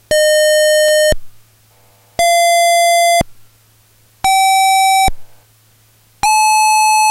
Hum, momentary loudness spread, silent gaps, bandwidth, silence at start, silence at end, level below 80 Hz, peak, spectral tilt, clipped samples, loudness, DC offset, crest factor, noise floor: none; 7 LU; none; 16 kHz; 0.1 s; 0 s; -36 dBFS; -2 dBFS; -0.5 dB/octave; under 0.1%; -11 LUFS; under 0.1%; 10 dB; -50 dBFS